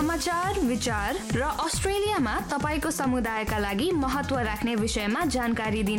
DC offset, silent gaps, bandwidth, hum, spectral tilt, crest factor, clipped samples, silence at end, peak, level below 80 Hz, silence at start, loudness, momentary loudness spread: under 0.1%; none; 17 kHz; none; -4.5 dB/octave; 12 dB; under 0.1%; 0 s; -14 dBFS; -40 dBFS; 0 s; -27 LUFS; 2 LU